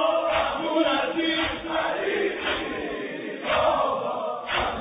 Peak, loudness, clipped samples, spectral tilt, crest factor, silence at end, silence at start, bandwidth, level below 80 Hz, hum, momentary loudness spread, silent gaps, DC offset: -10 dBFS; -25 LUFS; under 0.1%; -6.5 dB/octave; 16 dB; 0 s; 0 s; 5.2 kHz; -50 dBFS; none; 8 LU; none; under 0.1%